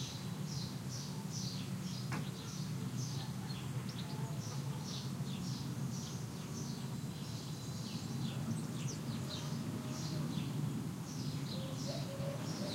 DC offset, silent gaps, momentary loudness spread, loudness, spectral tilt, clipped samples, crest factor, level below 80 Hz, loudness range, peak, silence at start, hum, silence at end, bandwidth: under 0.1%; none; 3 LU; -42 LUFS; -5 dB/octave; under 0.1%; 14 dB; -66 dBFS; 2 LU; -26 dBFS; 0 s; none; 0 s; 16 kHz